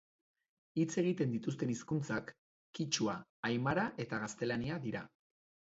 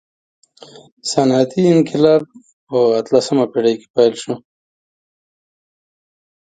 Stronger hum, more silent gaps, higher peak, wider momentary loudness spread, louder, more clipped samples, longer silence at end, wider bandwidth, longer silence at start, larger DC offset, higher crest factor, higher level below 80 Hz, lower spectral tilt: neither; first, 2.38-2.73 s, 3.29-3.43 s vs 2.53-2.67 s, 3.90-3.94 s; second, -18 dBFS vs 0 dBFS; second, 9 LU vs 13 LU; second, -37 LUFS vs -15 LUFS; neither; second, 0.6 s vs 2.1 s; second, 7.6 kHz vs 9.4 kHz; second, 0.75 s vs 1.05 s; neither; about the same, 20 dB vs 18 dB; second, -68 dBFS vs -62 dBFS; about the same, -5 dB/octave vs -6 dB/octave